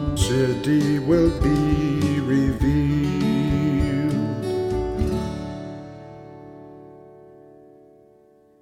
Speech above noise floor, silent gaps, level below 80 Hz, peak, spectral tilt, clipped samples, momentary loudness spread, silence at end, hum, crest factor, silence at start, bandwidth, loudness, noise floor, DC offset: 35 dB; none; -34 dBFS; -6 dBFS; -7 dB/octave; under 0.1%; 21 LU; 1.5 s; none; 16 dB; 0 s; 15.5 kHz; -22 LUFS; -54 dBFS; under 0.1%